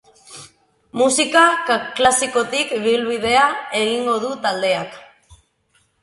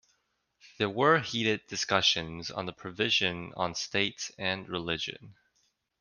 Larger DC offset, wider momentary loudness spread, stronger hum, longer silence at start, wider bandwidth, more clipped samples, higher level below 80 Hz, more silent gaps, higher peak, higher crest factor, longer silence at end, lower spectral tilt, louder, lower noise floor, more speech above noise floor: neither; about the same, 14 LU vs 12 LU; neither; second, 0.3 s vs 0.65 s; about the same, 11.5 kHz vs 10.5 kHz; neither; first, -56 dBFS vs -64 dBFS; neither; first, 0 dBFS vs -8 dBFS; about the same, 20 dB vs 24 dB; first, 1 s vs 0.7 s; about the same, -2 dB/octave vs -3 dB/octave; first, -17 LUFS vs -29 LUFS; second, -62 dBFS vs -76 dBFS; about the same, 45 dB vs 46 dB